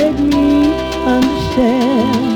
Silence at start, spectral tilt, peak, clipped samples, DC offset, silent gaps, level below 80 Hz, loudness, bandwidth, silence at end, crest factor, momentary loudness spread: 0 s; -6 dB/octave; -2 dBFS; under 0.1%; under 0.1%; none; -32 dBFS; -13 LUFS; 17.5 kHz; 0 s; 12 dB; 3 LU